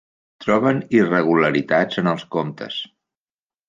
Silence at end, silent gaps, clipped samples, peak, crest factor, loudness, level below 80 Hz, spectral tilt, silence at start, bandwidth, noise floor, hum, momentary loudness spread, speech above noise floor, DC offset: 0.85 s; none; under 0.1%; -2 dBFS; 18 dB; -19 LUFS; -60 dBFS; -7 dB/octave; 0.4 s; 7.6 kHz; under -90 dBFS; none; 12 LU; over 71 dB; under 0.1%